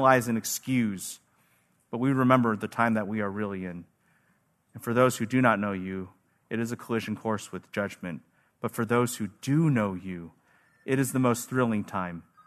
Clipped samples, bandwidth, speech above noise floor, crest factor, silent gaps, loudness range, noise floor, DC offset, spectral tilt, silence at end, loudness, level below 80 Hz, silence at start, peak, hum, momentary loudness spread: under 0.1%; 13.5 kHz; 42 dB; 24 dB; none; 4 LU; -69 dBFS; under 0.1%; -6 dB/octave; 0.25 s; -28 LUFS; -70 dBFS; 0 s; -4 dBFS; none; 15 LU